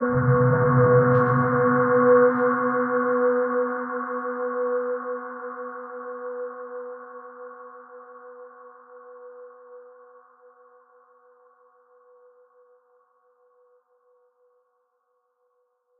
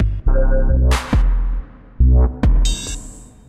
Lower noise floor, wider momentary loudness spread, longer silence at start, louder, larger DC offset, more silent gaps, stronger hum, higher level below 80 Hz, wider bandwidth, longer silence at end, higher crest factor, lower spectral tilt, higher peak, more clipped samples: first, -72 dBFS vs -36 dBFS; first, 27 LU vs 13 LU; about the same, 0 s vs 0 s; second, -22 LUFS vs -18 LUFS; neither; neither; neither; second, -60 dBFS vs -16 dBFS; second, 2.4 kHz vs 12 kHz; first, 6.2 s vs 0.25 s; first, 18 dB vs 12 dB; first, -13 dB/octave vs -6 dB/octave; about the same, -6 dBFS vs -4 dBFS; neither